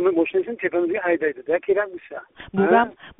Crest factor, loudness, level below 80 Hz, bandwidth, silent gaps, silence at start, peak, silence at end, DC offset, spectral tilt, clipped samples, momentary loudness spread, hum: 18 dB; -22 LUFS; -60 dBFS; 3.9 kHz; none; 0 s; -4 dBFS; 0.1 s; under 0.1%; -1.5 dB/octave; under 0.1%; 14 LU; none